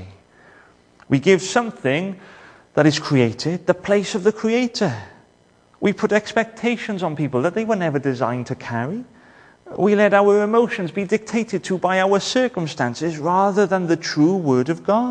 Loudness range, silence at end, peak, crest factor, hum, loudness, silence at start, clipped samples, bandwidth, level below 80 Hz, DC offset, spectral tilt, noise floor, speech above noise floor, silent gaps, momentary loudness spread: 4 LU; 0 s; -2 dBFS; 18 dB; none; -20 LUFS; 0 s; under 0.1%; 10 kHz; -60 dBFS; under 0.1%; -5.5 dB/octave; -56 dBFS; 37 dB; none; 8 LU